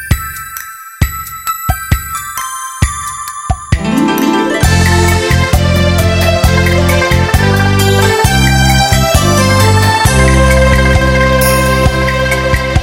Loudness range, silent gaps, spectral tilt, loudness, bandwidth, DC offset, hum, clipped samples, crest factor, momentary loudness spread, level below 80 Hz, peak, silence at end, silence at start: 8 LU; none; -5 dB/octave; -10 LUFS; 17 kHz; under 0.1%; none; 0.3%; 10 dB; 10 LU; -18 dBFS; 0 dBFS; 0 s; 0 s